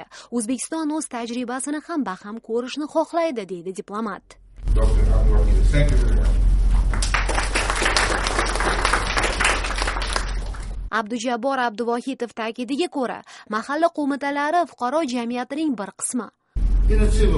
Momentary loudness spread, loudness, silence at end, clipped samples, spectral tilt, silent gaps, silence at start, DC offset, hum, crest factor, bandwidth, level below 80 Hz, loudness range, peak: 10 LU; -23 LUFS; 0 s; under 0.1%; -4.5 dB/octave; none; 0 s; under 0.1%; none; 16 dB; 11.5 kHz; -24 dBFS; 5 LU; -4 dBFS